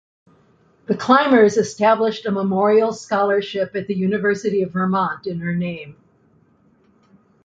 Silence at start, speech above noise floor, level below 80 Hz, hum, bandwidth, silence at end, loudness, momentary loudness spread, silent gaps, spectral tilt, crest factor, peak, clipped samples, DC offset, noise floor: 0.9 s; 39 dB; -60 dBFS; none; 7.8 kHz; 1.55 s; -19 LUFS; 10 LU; none; -6 dB/octave; 18 dB; -2 dBFS; under 0.1%; under 0.1%; -57 dBFS